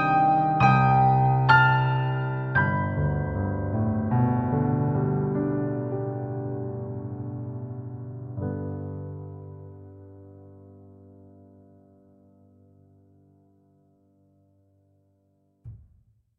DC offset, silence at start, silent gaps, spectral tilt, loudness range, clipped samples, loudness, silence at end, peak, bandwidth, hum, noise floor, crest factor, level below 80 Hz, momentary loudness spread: under 0.1%; 0 s; none; -9 dB/octave; 17 LU; under 0.1%; -24 LUFS; 0.6 s; -4 dBFS; 6 kHz; none; -67 dBFS; 22 dB; -48 dBFS; 19 LU